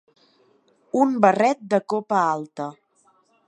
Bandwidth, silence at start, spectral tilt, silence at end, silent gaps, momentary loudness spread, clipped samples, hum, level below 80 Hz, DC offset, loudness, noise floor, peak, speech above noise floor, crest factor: 10.5 kHz; 0.95 s; -6 dB/octave; 0.75 s; none; 15 LU; under 0.1%; none; -78 dBFS; under 0.1%; -21 LUFS; -62 dBFS; -2 dBFS; 41 dB; 22 dB